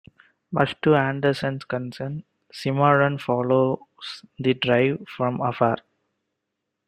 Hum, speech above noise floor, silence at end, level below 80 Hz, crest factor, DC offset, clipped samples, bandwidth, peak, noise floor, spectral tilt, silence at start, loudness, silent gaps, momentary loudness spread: none; 58 dB; 1.1 s; -62 dBFS; 22 dB; under 0.1%; under 0.1%; 10.5 kHz; -2 dBFS; -81 dBFS; -7.5 dB/octave; 0.5 s; -23 LUFS; none; 13 LU